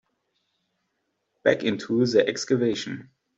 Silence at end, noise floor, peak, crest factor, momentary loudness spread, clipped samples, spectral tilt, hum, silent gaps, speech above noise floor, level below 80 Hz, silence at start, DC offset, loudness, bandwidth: 0.35 s; -77 dBFS; -4 dBFS; 22 dB; 11 LU; under 0.1%; -5 dB/octave; none; none; 53 dB; -68 dBFS; 1.45 s; under 0.1%; -24 LUFS; 8 kHz